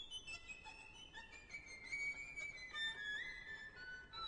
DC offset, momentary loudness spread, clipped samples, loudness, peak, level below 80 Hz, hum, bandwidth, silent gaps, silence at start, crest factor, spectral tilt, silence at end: under 0.1%; 12 LU; under 0.1%; -48 LUFS; -34 dBFS; -68 dBFS; none; 10 kHz; none; 0 s; 16 dB; -1 dB/octave; 0 s